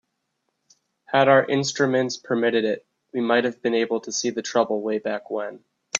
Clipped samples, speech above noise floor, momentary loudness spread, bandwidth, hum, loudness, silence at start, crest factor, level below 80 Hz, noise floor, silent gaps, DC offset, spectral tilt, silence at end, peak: under 0.1%; 54 dB; 12 LU; 7.8 kHz; none; -23 LUFS; 1.1 s; 20 dB; -70 dBFS; -76 dBFS; none; under 0.1%; -4 dB/octave; 0 s; -2 dBFS